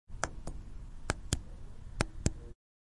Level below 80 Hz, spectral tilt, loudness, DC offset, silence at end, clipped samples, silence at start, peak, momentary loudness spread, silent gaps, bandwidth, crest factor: -44 dBFS; -4 dB/octave; -39 LUFS; under 0.1%; 0.35 s; under 0.1%; 0.1 s; -8 dBFS; 16 LU; none; 11.5 kHz; 32 dB